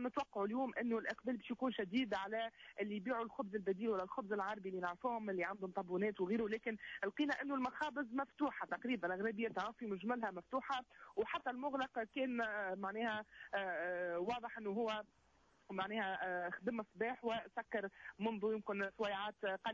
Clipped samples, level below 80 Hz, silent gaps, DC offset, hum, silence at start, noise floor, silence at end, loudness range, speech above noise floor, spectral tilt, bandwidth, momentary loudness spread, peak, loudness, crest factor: under 0.1%; -78 dBFS; none; under 0.1%; none; 0 s; -71 dBFS; 0 s; 2 LU; 29 dB; -6 dB/octave; 7.6 kHz; 5 LU; -28 dBFS; -42 LUFS; 14 dB